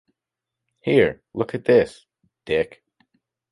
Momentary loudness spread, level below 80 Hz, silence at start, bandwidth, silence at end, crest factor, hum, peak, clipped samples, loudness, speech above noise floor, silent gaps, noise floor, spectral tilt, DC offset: 11 LU; -54 dBFS; 0.85 s; 11 kHz; 0.85 s; 20 dB; none; -4 dBFS; under 0.1%; -21 LUFS; 65 dB; none; -85 dBFS; -7 dB/octave; under 0.1%